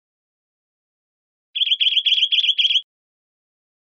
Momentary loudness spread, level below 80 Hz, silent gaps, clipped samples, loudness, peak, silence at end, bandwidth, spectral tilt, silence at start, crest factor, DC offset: 6 LU; under -90 dBFS; none; under 0.1%; -16 LUFS; -6 dBFS; 1.15 s; 7.2 kHz; 16 dB/octave; 1.55 s; 18 dB; under 0.1%